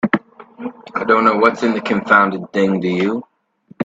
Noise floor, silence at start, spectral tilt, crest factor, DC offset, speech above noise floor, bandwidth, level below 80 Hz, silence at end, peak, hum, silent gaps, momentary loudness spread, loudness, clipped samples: -50 dBFS; 0.05 s; -6.5 dB/octave; 18 dB; under 0.1%; 34 dB; 8 kHz; -60 dBFS; 0 s; 0 dBFS; none; none; 14 LU; -16 LUFS; under 0.1%